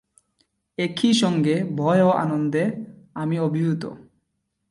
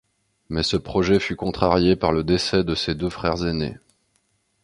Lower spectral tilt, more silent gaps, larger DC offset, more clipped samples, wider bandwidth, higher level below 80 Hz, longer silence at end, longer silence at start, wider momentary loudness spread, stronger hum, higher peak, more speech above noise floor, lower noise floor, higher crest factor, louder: about the same, -6 dB/octave vs -5.5 dB/octave; neither; neither; neither; about the same, 11.5 kHz vs 11.5 kHz; second, -64 dBFS vs -40 dBFS; second, 0.7 s vs 0.9 s; first, 0.8 s vs 0.5 s; first, 15 LU vs 7 LU; neither; second, -6 dBFS vs 0 dBFS; first, 54 dB vs 47 dB; first, -75 dBFS vs -68 dBFS; second, 16 dB vs 22 dB; about the same, -22 LUFS vs -22 LUFS